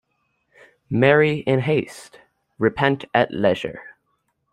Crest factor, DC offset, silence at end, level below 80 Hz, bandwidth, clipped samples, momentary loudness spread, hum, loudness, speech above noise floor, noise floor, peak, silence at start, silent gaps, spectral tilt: 20 dB; under 0.1%; 0.65 s; -58 dBFS; 12 kHz; under 0.1%; 17 LU; none; -20 LUFS; 51 dB; -71 dBFS; -2 dBFS; 0.9 s; none; -7 dB/octave